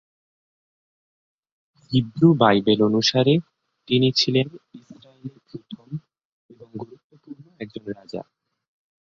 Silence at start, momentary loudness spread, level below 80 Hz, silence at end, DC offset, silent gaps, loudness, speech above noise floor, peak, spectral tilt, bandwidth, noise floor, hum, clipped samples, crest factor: 1.9 s; 23 LU; -62 dBFS; 0.8 s; under 0.1%; 6.25-6.49 s, 7.04-7.10 s; -19 LUFS; 23 dB; -2 dBFS; -6 dB/octave; 7.6 kHz; -44 dBFS; none; under 0.1%; 22 dB